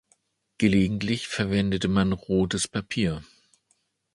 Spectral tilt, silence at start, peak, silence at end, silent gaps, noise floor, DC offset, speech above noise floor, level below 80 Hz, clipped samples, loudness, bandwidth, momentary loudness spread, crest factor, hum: -5.5 dB/octave; 0.6 s; -8 dBFS; 0.9 s; none; -71 dBFS; under 0.1%; 46 dB; -46 dBFS; under 0.1%; -25 LUFS; 11.5 kHz; 5 LU; 20 dB; none